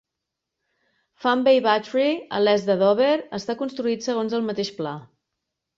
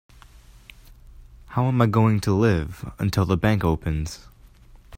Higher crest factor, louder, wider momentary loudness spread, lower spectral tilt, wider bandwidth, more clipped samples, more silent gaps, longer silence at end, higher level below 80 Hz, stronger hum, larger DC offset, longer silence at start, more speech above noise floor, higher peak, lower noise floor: about the same, 18 dB vs 20 dB; about the same, -22 LUFS vs -22 LUFS; about the same, 10 LU vs 12 LU; second, -5 dB/octave vs -7.5 dB/octave; second, 7.6 kHz vs 16 kHz; neither; neither; first, 0.75 s vs 0 s; second, -68 dBFS vs -40 dBFS; neither; neither; about the same, 1.2 s vs 1.2 s; first, 62 dB vs 28 dB; about the same, -6 dBFS vs -4 dBFS; first, -83 dBFS vs -49 dBFS